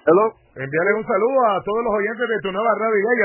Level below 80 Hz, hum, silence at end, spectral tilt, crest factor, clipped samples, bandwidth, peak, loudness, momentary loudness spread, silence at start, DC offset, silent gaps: -56 dBFS; none; 0 s; -10 dB/octave; 16 dB; under 0.1%; 3.1 kHz; -4 dBFS; -20 LUFS; 6 LU; 0.05 s; under 0.1%; none